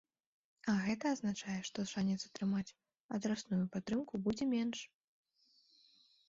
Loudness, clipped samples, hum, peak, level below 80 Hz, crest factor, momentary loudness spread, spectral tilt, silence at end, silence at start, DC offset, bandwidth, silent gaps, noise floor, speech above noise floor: -39 LUFS; under 0.1%; none; -24 dBFS; -72 dBFS; 16 dB; 8 LU; -5.5 dB/octave; 1.4 s; 0.65 s; under 0.1%; 7.6 kHz; 3.00-3.09 s; -73 dBFS; 35 dB